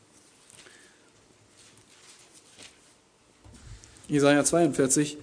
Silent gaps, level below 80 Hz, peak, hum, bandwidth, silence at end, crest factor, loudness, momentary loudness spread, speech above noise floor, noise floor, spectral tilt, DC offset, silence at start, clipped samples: none; -60 dBFS; -8 dBFS; none; 11 kHz; 0 s; 22 dB; -23 LUFS; 28 LU; 38 dB; -61 dBFS; -4 dB/octave; under 0.1%; 3.7 s; under 0.1%